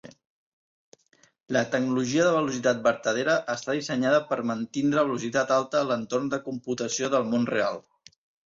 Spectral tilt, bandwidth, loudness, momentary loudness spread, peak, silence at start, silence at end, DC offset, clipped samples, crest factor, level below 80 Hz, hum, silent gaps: -4.5 dB/octave; 7.8 kHz; -26 LUFS; 6 LU; -8 dBFS; 0.05 s; 0.65 s; under 0.1%; under 0.1%; 18 dB; -68 dBFS; none; 0.25-0.92 s, 1.40-1.44 s